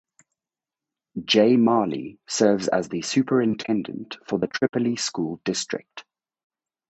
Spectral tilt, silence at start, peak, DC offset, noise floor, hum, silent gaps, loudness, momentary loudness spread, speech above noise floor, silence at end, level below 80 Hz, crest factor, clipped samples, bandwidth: -4.5 dB/octave; 1.15 s; -4 dBFS; under 0.1%; under -90 dBFS; none; none; -23 LUFS; 16 LU; over 67 dB; 0.9 s; -66 dBFS; 20 dB; under 0.1%; 8.4 kHz